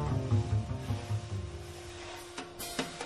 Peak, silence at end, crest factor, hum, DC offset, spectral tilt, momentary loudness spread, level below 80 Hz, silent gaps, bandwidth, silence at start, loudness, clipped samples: -18 dBFS; 0 s; 16 dB; none; under 0.1%; -5.5 dB/octave; 13 LU; -48 dBFS; none; 13 kHz; 0 s; -36 LUFS; under 0.1%